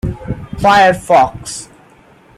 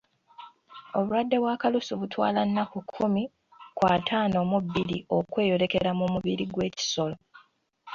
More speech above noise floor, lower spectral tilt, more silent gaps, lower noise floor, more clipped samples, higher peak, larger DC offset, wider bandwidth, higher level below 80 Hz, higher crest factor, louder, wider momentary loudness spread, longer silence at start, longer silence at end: about the same, 34 dB vs 34 dB; about the same, -4.5 dB/octave vs -5.5 dB/octave; neither; second, -45 dBFS vs -61 dBFS; neither; first, 0 dBFS vs -8 dBFS; neither; first, 15 kHz vs 7.4 kHz; first, -34 dBFS vs -58 dBFS; about the same, 14 dB vs 18 dB; first, -11 LUFS vs -27 LUFS; first, 17 LU vs 8 LU; second, 0.05 s vs 0.4 s; first, 0.75 s vs 0 s